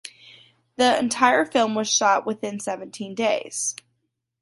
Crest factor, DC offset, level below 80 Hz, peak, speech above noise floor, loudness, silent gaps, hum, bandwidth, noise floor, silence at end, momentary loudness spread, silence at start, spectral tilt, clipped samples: 22 dB; under 0.1%; -70 dBFS; -2 dBFS; 53 dB; -22 LUFS; none; none; 11.5 kHz; -75 dBFS; 0.7 s; 13 LU; 0.05 s; -2 dB/octave; under 0.1%